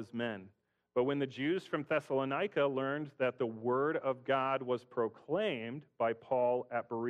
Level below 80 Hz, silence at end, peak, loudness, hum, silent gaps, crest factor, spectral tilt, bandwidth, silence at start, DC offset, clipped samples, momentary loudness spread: -80 dBFS; 0 s; -20 dBFS; -35 LUFS; none; none; 16 dB; -7 dB/octave; 10 kHz; 0 s; under 0.1%; under 0.1%; 6 LU